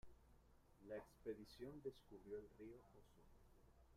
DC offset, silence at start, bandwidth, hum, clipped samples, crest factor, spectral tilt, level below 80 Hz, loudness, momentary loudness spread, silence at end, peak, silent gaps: under 0.1%; 0.05 s; 15.5 kHz; none; under 0.1%; 20 dB; -6.5 dB/octave; -72 dBFS; -57 LUFS; 9 LU; 0 s; -40 dBFS; none